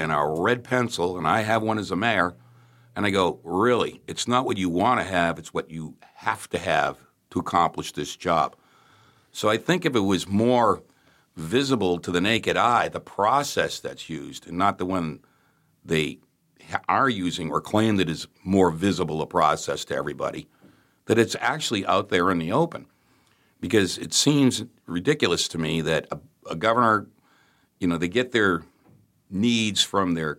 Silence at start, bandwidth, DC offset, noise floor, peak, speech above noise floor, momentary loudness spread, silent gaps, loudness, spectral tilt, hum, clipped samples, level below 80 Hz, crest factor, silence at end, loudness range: 0 s; 16.5 kHz; under 0.1%; -64 dBFS; -6 dBFS; 40 dB; 11 LU; none; -24 LUFS; -4.5 dB/octave; none; under 0.1%; -56 dBFS; 20 dB; 0.05 s; 3 LU